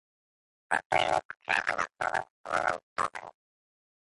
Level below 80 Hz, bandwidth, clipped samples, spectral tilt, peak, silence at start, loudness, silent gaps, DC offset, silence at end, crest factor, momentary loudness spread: -64 dBFS; 11.5 kHz; under 0.1%; -2.5 dB/octave; -12 dBFS; 0.7 s; -31 LUFS; 0.85-0.90 s, 1.25-1.29 s, 2.30-2.44 s, 2.83-2.96 s; under 0.1%; 0.8 s; 22 dB; 8 LU